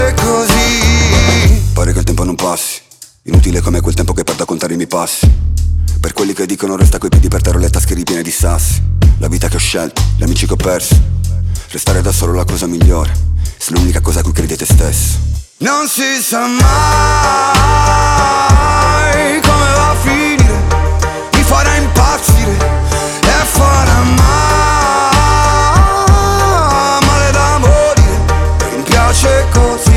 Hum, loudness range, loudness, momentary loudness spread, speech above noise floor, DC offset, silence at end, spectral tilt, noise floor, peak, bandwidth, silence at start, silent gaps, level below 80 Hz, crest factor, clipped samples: none; 4 LU; -11 LUFS; 6 LU; 28 dB; under 0.1%; 0 s; -4.5 dB/octave; -38 dBFS; 0 dBFS; 17 kHz; 0 s; none; -14 dBFS; 10 dB; under 0.1%